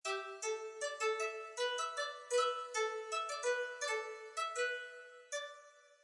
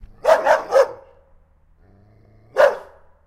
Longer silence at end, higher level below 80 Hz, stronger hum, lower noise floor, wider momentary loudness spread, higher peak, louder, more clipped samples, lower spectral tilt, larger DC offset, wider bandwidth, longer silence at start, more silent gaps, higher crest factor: second, 0.1 s vs 0.45 s; second, under -90 dBFS vs -52 dBFS; neither; first, -61 dBFS vs -54 dBFS; about the same, 8 LU vs 10 LU; second, -24 dBFS vs -2 dBFS; second, -39 LUFS vs -18 LUFS; neither; second, 2.5 dB/octave vs -2.5 dB/octave; neither; second, 11.5 kHz vs 15.5 kHz; second, 0.05 s vs 0.25 s; neither; about the same, 16 dB vs 18 dB